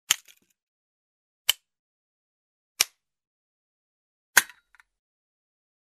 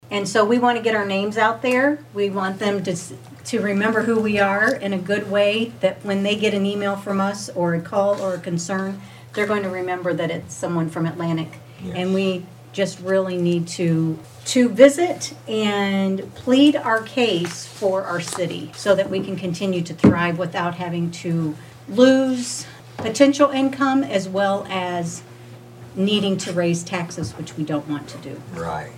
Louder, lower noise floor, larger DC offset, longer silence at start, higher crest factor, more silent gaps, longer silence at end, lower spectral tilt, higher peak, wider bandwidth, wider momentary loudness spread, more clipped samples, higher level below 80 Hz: second, -25 LUFS vs -21 LUFS; first, -56 dBFS vs -41 dBFS; neither; about the same, 0.1 s vs 0.05 s; first, 32 dB vs 20 dB; first, 0.63-1.45 s, 1.79-2.75 s, 3.27-4.34 s vs none; first, 1.5 s vs 0 s; second, 3 dB/octave vs -5 dB/octave; about the same, -2 dBFS vs -2 dBFS; second, 14 kHz vs 16 kHz; second, 9 LU vs 13 LU; neither; second, -74 dBFS vs -58 dBFS